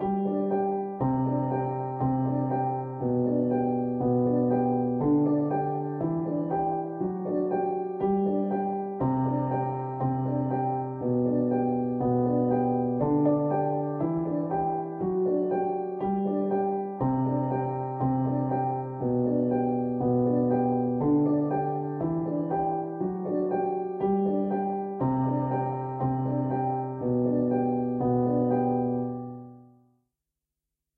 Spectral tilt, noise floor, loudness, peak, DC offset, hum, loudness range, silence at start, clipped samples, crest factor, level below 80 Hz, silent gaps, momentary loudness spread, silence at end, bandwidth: -13.5 dB/octave; -87 dBFS; -27 LUFS; -12 dBFS; under 0.1%; none; 2 LU; 0 s; under 0.1%; 14 dB; -58 dBFS; none; 5 LU; 1.35 s; 3.2 kHz